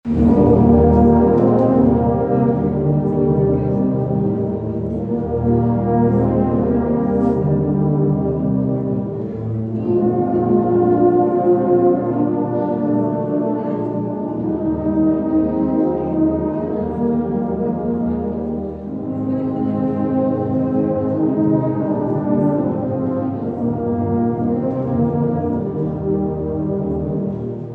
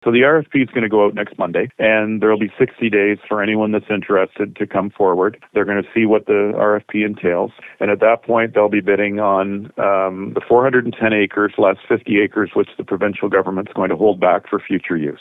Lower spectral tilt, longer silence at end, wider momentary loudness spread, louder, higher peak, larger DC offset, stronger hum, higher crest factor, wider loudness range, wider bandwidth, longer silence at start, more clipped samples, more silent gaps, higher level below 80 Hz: first, -12.5 dB/octave vs -9 dB/octave; about the same, 0 s vs 0.05 s; about the same, 8 LU vs 6 LU; about the same, -18 LUFS vs -17 LUFS; about the same, -4 dBFS vs -2 dBFS; neither; neither; about the same, 14 dB vs 14 dB; about the same, 4 LU vs 2 LU; second, 3.5 kHz vs 3.9 kHz; about the same, 0.05 s vs 0.05 s; neither; neither; first, -38 dBFS vs -58 dBFS